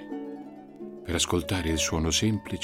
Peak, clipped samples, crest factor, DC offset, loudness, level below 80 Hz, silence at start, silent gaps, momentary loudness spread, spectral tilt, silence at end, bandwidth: -12 dBFS; under 0.1%; 16 dB; under 0.1%; -27 LUFS; -42 dBFS; 0 s; none; 18 LU; -3.5 dB/octave; 0 s; 17 kHz